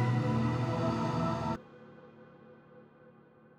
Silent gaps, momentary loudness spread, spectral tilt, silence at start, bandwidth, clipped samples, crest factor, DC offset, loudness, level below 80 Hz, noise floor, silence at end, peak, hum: none; 24 LU; -8 dB/octave; 0 s; 9.2 kHz; under 0.1%; 14 dB; under 0.1%; -32 LUFS; -58 dBFS; -59 dBFS; 0.5 s; -20 dBFS; none